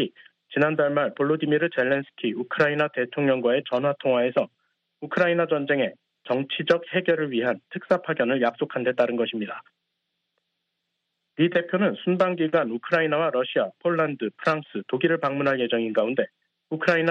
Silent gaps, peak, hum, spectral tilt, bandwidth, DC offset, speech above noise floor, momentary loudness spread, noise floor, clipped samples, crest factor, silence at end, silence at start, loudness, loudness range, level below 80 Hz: none; -6 dBFS; none; -7.5 dB/octave; 7.4 kHz; under 0.1%; 56 dB; 7 LU; -79 dBFS; under 0.1%; 18 dB; 0 s; 0 s; -24 LUFS; 4 LU; -72 dBFS